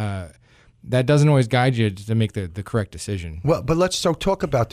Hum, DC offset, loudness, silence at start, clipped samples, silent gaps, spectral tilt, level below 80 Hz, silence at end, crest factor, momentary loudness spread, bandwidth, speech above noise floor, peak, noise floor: none; under 0.1%; -21 LUFS; 0 s; under 0.1%; none; -6 dB/octave; -42 dBFS; 0.05 s; 14 dB; 12 LU; 14 kHz; 34 dB; -6 dBFS; -54 dBFS